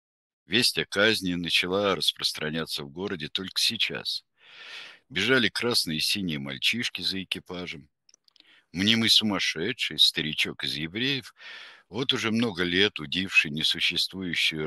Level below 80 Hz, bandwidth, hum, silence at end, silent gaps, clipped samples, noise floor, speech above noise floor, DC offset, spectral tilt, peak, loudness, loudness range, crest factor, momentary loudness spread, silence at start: -62 dBFS; 13 kHz; none; 0 s; none; under 0.1%; -61 dBFS; 34 dB; under 0.1%; -3 dB/octave; -4 dBFS; -25 LUFS; 4 LU; 24 dB; 15 LU; 0.5 s